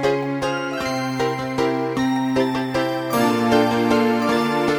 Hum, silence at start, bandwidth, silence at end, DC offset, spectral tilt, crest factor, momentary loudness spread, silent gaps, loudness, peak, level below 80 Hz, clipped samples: none; 0 s; 19.5 kHz; 0 s; under 0.1%; -5.5 dB/octave; 16 dB; 6 LU; none; -20 LUFS; -4 dBFS; -50 dBFS; under 0.1%